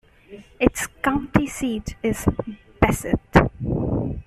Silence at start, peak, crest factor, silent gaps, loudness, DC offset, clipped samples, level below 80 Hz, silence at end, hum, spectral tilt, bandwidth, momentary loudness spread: 0.3 s; -2 dBFS; 20 dB; none; -22 LUFS; under 0.1%; under 0.1%; -34 dBFS; 0.05 s; none; -6 dB/octave; 14.5 kHz; 8 LU